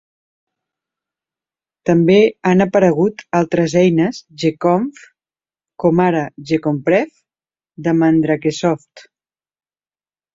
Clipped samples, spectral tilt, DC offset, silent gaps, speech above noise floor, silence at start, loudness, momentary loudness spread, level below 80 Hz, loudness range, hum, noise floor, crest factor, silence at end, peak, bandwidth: under 0.1%; -7 dB/octave; under 0.1%; none; over 75 dB; 1.85 s; -16 LUFS; 8 LU; -56 dBFS; 4 LU; none; under -90 dBFS; 16 dB; 1.35 s; 0 dBFS; 7.8 kHz